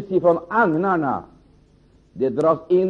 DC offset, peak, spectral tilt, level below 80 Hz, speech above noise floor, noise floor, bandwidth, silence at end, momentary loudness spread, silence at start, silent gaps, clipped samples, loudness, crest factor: under 0.1%; -6 dBFS; -9 dB/octave; -56 dBFS; 35 dB; -54 dBFS; 8 kHz; 0 s; 7 LU; 0 s; none; under 0.1%; -20 LUFS; 16 dB